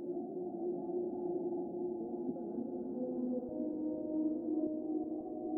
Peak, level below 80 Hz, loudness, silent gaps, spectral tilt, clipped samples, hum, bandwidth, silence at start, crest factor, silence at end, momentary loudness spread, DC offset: -26 dBFS; -74 dBFS; -39 LUFS; none; -13 dB/octave; under 0.1%; none; 1.6 kHz; 0 s; 14 dB; 0 s; 5 LU; under 0.1%